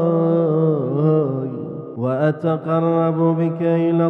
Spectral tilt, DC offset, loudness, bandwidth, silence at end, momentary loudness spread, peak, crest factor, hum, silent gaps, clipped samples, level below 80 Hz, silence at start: -11.5 dB/octave; under 0.1%; -19 LUFS; 4.1 kHz; 0 s; 8 LU; -6 dBFS; 12 dB; none; none; under 0.1%; -66 dBFS; 0 s